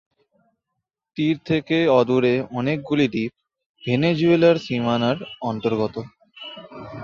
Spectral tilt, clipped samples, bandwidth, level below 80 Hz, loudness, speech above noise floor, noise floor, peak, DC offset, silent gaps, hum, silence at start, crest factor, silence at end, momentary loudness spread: -7.5 dB/octave; under 0.1%; 7.2 kHz; -58 dBFS; -21 LUFS; 61 dB; -81 dBFS; -4 dBFS; under 0.1%; 3.66-3.75 s; none; 1.15 s; 18 dB; 0 s; 20 LU